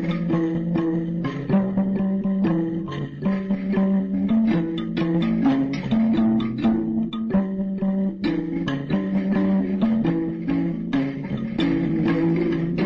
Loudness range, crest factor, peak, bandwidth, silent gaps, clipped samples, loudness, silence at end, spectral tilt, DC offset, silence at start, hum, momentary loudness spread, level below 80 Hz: 2 LU; 12 dB; -10 dBFS; 6 kHz; none; under 0.1%; -23 LUFS; 0 s; -9.5 dB/octave; under 0.1%; 0 s; none; 5 LU; -48 dBFS